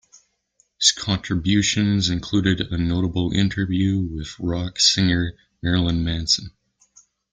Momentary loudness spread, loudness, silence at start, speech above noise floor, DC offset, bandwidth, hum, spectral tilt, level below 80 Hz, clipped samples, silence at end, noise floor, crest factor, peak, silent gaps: 8 LU; -21 LUFS; 0.8 s; 44 dB; under 0.1%; 9.4 kHz; none; -4 dB/octave; -42 dBFS; under 0.1%; 0.85 s; -65 dBFS; 20 dB; -2 dBFS; none